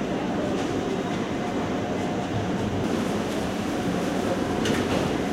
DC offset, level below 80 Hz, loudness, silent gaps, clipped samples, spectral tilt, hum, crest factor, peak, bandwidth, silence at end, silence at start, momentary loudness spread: under 0.1%; -48 dBFS; -26 LUFS; none; under 0.1%; -5.5 dB/octave; none; 16 dB; -10 dBFS; 16.5 kHz; 0 s; 0 s; 3 LU